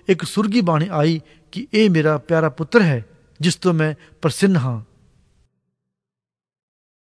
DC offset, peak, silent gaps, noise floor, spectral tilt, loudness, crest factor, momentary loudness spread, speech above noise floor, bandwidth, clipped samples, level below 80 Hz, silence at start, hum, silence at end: under 0.1%; 0 dBFS; none; -89 dBFS; -6.5 dB/octave; -19 LUFS; 20 dB; 10 LU; 71 dB; 11 kHz; under 0.1%; -58 dBFS; 0.1 s; none; 2.2 s